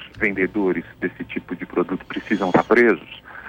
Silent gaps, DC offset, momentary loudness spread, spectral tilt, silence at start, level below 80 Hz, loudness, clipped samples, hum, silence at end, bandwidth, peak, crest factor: none; under 0.1%; 14 LU; -7 dB/octave; 0 s; -52 dBFS; -21 LUFS; under 0.1%; none; 0 s; 7.4 kHz; -4 dBFS; 18 dB